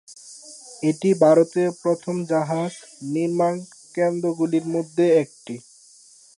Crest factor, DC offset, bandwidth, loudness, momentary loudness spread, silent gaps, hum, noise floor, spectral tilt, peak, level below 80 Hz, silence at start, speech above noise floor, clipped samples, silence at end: 18 dB; under 0.1%; 11.5 kHz; -22 LUFS; 20 LU; none; none; -51 dBFS; -6.5 dB/octave; -4 dBFS; -76 dBFS; 0.1 s; 30 dB; under 0.1%; 0.75 s